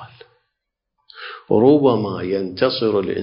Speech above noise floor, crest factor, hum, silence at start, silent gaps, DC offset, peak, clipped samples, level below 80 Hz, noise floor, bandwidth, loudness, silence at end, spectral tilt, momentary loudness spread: 62 dB; 18 dB; none; 0 s; none; under 0.1%; -2 dBFS; under 0.1%; -54 dBFS; -79 dBFS; 5.4 kHz; -17 LUFS; 0 s; -11 dB/octave; 21 LU